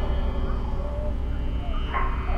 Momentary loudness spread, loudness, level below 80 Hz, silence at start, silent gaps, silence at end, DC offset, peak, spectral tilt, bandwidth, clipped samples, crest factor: 3 LU; -30 LUFS; -26 dBFS; 0 s; none; 0 s; under 0.1%; -14 dBFS; -8 dB/octave; 5.4 kHz; under 0.1%; 12 dB